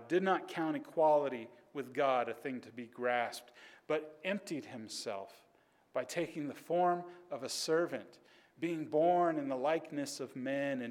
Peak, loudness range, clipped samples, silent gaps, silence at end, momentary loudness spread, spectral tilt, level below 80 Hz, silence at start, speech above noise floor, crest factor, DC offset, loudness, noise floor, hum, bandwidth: -18 dBFS; 5 LU; under 0.1%; none; 0 s; 14 LU; -4.5 dB/octave; -88 dBFS; 0 s; 34 dB; 18 dB; under 0.1%; -36 LUFS; -70 dBFS; none; 17 kHz